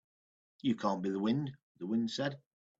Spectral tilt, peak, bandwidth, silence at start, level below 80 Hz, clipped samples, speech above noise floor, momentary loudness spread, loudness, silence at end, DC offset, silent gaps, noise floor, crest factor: -6.5 dB/octave; -18 dBFS; 8 kHz; 0.65 s; -76 dBFS; under 0.1%; over 56 dB; 11 LU; -35 LUFS; 0.45 s; under 0.1%; 1.63-1.75 s; under -90 dBFS; 18 dB